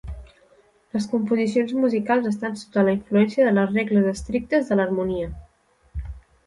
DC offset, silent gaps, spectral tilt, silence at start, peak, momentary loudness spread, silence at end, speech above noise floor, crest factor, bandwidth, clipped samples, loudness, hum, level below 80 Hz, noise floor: under 0.1%; none; -7 dB/octave; 0.05 s; -6 dBFS; 17 LU; 0.3 s; 39 dB; 16 dB; 11.5 kHz; under 0.1%; -22 LUFS; none; -42 dBFS; -60 dBFS